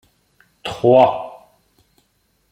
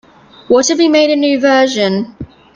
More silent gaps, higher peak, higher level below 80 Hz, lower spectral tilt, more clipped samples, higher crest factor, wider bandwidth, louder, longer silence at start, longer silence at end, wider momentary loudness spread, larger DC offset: neither; about the same, -2 dBFS vs 0 dBFS; second, -58 dBFS vs -50 dBFS; first, -7 dB/octave vs -3.5 dB/octave; neither; first, 18 dB vs 12 dB; first, 11 kHz vs 9.4 kHz; second, -15 LUFS vs -11 LUFS; first, 0.65 s vs 0.5 s; first, 1.2 s vs 0.3 s; first, 20 LU vs 10 LU; neither